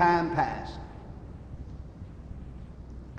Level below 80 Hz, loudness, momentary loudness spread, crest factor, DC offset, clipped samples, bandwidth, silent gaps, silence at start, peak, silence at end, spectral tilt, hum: -46 dBFS; -31 LUFS; 18 LU; 20 dB; under 0.1%; under 0.1%; 8.8 kHz; none; 0 s; -10 dBFS; 0 s; -7 dB/octave; none